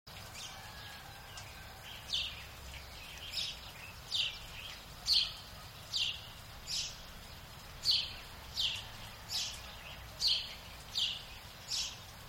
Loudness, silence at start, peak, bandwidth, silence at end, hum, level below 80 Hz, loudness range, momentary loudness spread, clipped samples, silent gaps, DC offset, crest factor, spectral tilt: -36 LUFS; 0.05 s; -16 dBFS; 16 kHz; 0 s; none; -56 dBFS; 6 LU; 18 LU; under 0.1%; none; under 0.1%; 24 dB; -0.5 dB/octave